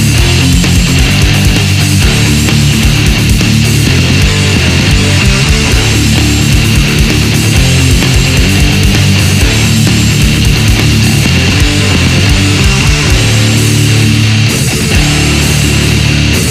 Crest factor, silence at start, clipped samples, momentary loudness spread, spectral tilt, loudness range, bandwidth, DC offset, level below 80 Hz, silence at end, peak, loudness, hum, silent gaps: 6 dB; 0 s; 0.9%; 1 LU; -4 dB/octave; 0 LU; 16 kHz; under 0.1%; -14 dBFS; 0 s; 0 dBFS; -7 LUFS; none; none